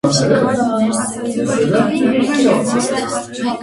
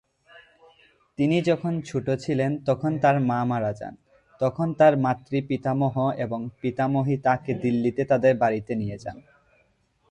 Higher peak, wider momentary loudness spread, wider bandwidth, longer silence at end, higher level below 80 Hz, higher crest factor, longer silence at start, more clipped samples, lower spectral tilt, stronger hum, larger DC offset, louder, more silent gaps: first, 0 dBFS vs -6 dBFS; second, 7 LU vs 10 LU; first, 11.5 kHz vs 9.6 kHz; second, 0 s vs 0.95 s; first, -50 dBFS vs -58 dBFS; about the same, 14 dB vs 18 dB; second, 0.05 s vs 1.2 s; neither; second, -5 dB/octave vs -8 dB/octave; neither; neither; first, -16 LUFS vs -24 LUFS; neither